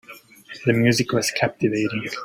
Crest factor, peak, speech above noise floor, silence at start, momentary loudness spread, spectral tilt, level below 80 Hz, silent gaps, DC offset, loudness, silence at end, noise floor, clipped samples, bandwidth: 20 dB; -4 dBFS; 22 dB; 0.1 s; 7 LU; -5 dB/octave; -56 dBFS; none; under 0.1%; -21 LUFS; 0 s; -43 dBFS; under 0.1%; 16.5 kHz